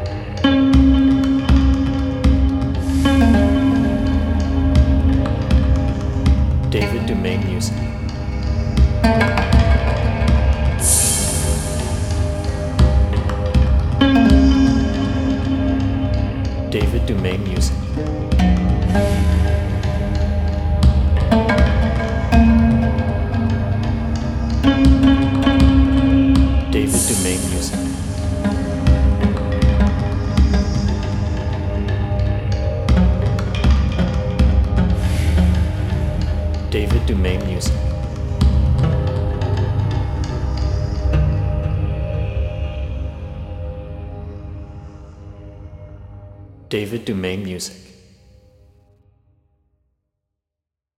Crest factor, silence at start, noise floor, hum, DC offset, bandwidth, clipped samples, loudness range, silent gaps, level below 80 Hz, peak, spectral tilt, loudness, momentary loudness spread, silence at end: 16 dB; 0 s; -85 dBFS; none; under 0.1%; 13.5 kHz; under 0.1%; 12 LU; none; -20 dBFS; -2 dBFS; -6 dB/octave; -17 LUFS; 11 LU; 3.2 s